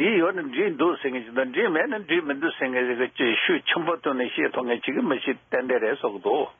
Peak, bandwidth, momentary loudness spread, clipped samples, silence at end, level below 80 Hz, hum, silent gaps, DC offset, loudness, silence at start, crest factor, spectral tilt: -10 dBFS; 3.8 kHz; 5 LU; under 0.1%; 0.1 s; -74 dBFS; none; none; under 0.1%; -24 LUFS; 0 s; 14 dB; -2 dB/octave